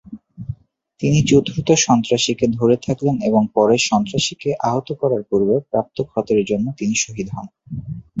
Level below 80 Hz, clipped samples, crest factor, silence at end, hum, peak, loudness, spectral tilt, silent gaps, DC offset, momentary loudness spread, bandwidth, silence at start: -48 dBFS; under 0.1%; 18 dB; 0 s; none; -2 dBFS; -18 LUFS; -5 dB/octave; none; under 0.1%; 16 LU; 8.2 kHz; 0.1 s